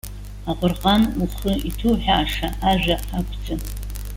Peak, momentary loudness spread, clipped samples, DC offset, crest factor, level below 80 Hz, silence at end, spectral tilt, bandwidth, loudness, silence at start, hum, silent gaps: -4 dBFS; 12 LU; under 0.1%; under 0.1%; 16 dB; -30 dBFS; 0 s; -5.5 dB/octave; 17 kHz; -22 LUFS; 0.05 s; 50 Hz at -30 dBFS; none